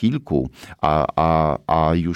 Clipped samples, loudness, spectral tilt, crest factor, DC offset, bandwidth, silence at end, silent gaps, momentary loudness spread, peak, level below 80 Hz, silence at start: under 0.1%; -20 LUFS; -8.5 dB/octave; 14 dB; under 0.1%; 9.8 kHz; 0 s; none; 6 LU; -4 dBFS; -36 dBFS; 0 s